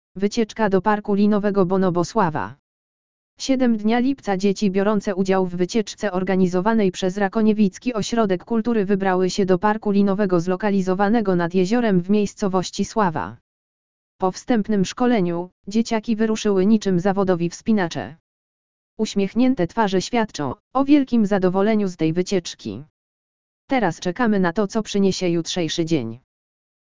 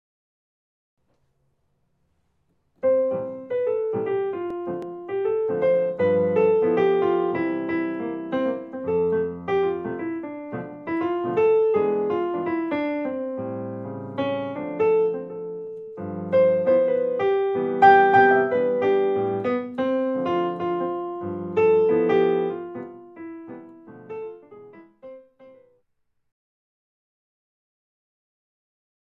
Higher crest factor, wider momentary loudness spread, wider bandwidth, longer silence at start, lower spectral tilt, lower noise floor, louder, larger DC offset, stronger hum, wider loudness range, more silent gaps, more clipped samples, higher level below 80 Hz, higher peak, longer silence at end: about the same, 16 dB vs 20 dB; second, 6 LU vs 15 LU; first, 7.6 kHz vs 6 kHz; second, 0.15 s vs 2.85 s; second, -6 dB/octave vs -8.5 dB/octave; first, under -90 dBFS vs -71 dBFS; first, -20 LUFS vs -23 LUFS; first, 2% vs under 0.1%; neither; second, 3 LU vs 11 LU; first, 2.59-3.37 s, 13.41-14.19 s, 15.52-15.64 s, 18.20-18.97 s, 20.60-20.71 s, 22.90-23.68 s vs none; neither; first, -50 dBFS vs -60 dBFS; about the same, -4 dBFS vs -4 dBFS; second, 0.7 s vs 3.65 s